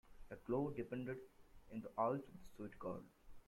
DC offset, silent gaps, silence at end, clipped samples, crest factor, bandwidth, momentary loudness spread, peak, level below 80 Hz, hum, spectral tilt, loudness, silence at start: under 0.1%; none; 0.05 s; under 0.1%; 20 dB; 16.5 kHz; 17 LU; -26 dBFS; -66 dBFS; none; -8.5 dB/octave; -46 LUFS; 0.05 s